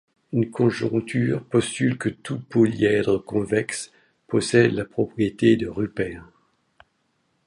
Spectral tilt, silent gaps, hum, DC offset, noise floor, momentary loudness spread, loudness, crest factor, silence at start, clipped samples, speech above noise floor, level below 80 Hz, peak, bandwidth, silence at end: -6 dB/octave; none; none; under 0.1%; -70 dBFS; 10 LU; -23 LUFS; 20 dB; 0.3 s; under 0.1%; 48 dB; -54 dBFS; -4 dBFS; 11.5 kHz; 1.25 s